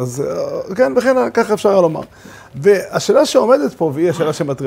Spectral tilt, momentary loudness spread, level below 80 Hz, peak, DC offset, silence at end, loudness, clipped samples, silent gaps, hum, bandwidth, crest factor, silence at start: -5.5 dB/octave; 10 LU; -54 dBFS; 0 dBFS; under 0.1%; 0 s; -15 LUFS; under 0.1%; none; none; 16 kHz; 14 dB; 0 s